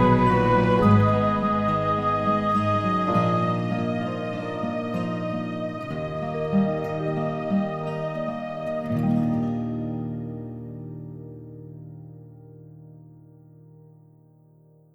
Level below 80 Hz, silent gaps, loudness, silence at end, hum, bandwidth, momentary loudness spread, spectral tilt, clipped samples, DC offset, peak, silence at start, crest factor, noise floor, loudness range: -48 dBFS; none; -24 LUFS; 1.75 s; none; 8.6 kHz; 19 LU; -8.5 dB/octave; under 0.1%; under 0.1%; -6 dBFS; 0 s; 18 dB; -55 dBFS; 19 LU